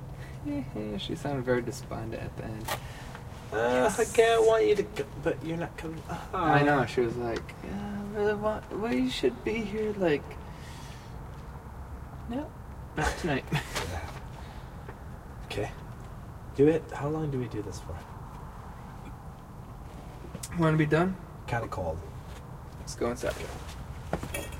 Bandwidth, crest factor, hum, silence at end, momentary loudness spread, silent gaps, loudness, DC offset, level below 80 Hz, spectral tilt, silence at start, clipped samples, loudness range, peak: 16 kHz; 22 dB; none; 0 s; 19 LU; none; -30 LUFS; under 0.1%; -46 dBFS; -5.5 dB/octave; 0 s; under 0.1%; 9 LU; -10 dBFS